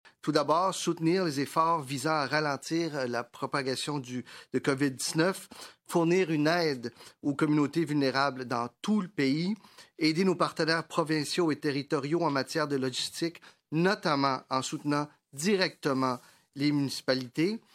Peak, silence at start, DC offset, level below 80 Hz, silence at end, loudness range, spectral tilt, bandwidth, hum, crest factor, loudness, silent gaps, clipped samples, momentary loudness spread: -10 dBFS; 0.05 s; under 0.1%; -78 dBFS; 0.15 s; 2 LU; -5 dB/octave; 16 kHz; none; 18 dB; -29 LUFS; none; under 0.1%; 8 LU